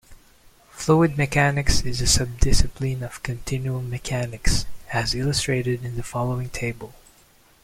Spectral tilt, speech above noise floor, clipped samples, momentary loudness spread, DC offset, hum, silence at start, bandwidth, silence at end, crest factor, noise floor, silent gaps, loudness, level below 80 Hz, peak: -4.5 dB/octave; 34 dB; under 0.1%; 10 LU; under 0.1%; none; 0.1 s; 16 kHz; 0.7 s; 20 dB; -55 dBFS; none; -24 LUFS; -30 dBFS; -2 dBFS